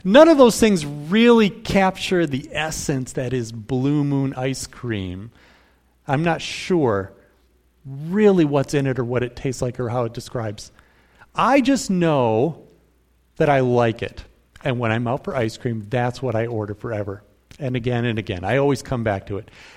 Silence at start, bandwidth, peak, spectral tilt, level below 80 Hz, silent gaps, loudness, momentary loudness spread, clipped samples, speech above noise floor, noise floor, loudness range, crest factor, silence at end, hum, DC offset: 0.05 s; 16 kHz; 0 dBFS; -6 dB/octave; -48 dBFS; none; -20 LUFS; 13 LU; under 0.1%; 40 dB; -60 dBFS; 5 LU; 20 dB; 0.1 s; none; under 0.1%